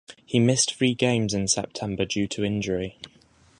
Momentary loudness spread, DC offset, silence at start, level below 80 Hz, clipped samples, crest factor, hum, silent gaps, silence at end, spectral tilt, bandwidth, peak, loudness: 10 LU; under 0.1%; 0.1 s; -52 dBFS; under 0.1%; 20 dB; none; none; 0.5 s; -4 dB/octave; 11.5 kHz; -6 dBFS; -24 LUFS